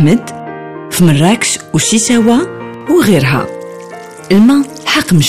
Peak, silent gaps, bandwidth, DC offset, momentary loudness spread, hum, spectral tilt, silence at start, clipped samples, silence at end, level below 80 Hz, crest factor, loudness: 0 dBFS; none; 15.5 kHz; under 0.1%; 18 LU; none; -4.5 dB/octave; 0 s; under 0.1%; 0 s; -44 dBFS; 10 dB; -10 LUFS